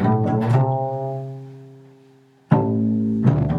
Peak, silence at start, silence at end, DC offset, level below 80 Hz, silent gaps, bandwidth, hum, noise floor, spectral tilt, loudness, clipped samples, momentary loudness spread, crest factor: -2 dBFS; 0 s; 0 s; under 0.1%; -46 dBFS; none; 5.2 kHz; none; -52 dBFS; -10.5 dB/octave; -20 LUFS; under 0.1%; 14 LU; 20 dB